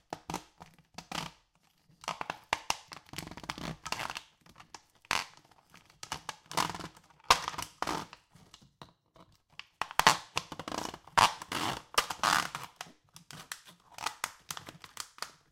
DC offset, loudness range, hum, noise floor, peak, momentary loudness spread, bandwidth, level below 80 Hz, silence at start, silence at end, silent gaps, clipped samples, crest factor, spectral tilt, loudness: under 0.1%; 10 LU; none; -70 dBFS; -2 dBFS; 22 LU; 17 kHz; -62 dBFS; 0.1 s; 0.2 s; none; under 0.1%; 36 dB; -1.5 dB/octave; -34 LUFS